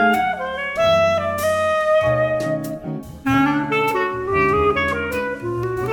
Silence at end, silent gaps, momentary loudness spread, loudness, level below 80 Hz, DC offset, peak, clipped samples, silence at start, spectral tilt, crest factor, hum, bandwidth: 0 s; none; 8 LU; -19 LUFS; -42 dBFS; under 0.1%; -6 dBFS; under 0.1%; 0 s; -5.5 dB/octave; 14 dB; none; 19 kHz